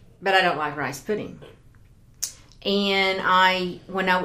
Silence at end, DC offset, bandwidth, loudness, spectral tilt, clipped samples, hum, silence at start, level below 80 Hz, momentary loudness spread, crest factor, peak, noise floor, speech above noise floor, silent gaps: 0 s; under 0.1%; 15.5 kHz; -23 LUFS; -3.5 dB/octave; under 0.1%; none; 0.2 s; -56 dBFS; 14 LU; 22 dB; -2 dBFS; -52 dBFS; 29 dB; none